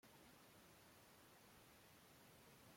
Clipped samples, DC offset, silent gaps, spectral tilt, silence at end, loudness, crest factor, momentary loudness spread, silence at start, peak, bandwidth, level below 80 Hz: under 0.1%; under 0.1%; none; -3.5 dB/octave; 0 s; -67 LUFS; 14 dB; 1 LU; 0.05 s; -54 dBFS; 16.5 kHz; -86 dBFS